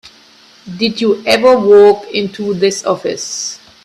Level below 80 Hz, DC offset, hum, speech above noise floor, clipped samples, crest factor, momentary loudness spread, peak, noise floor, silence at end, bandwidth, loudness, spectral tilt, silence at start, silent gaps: -54 dBFS; under 0.1%; none; 32 dB; under 0.1%; 12 dB; 13 LU; 0 dBFS; -44 dBFS; 0.3 s; 12.5 kHz; -12 LUFS; -3.5 dB/octave; 0.65 s; none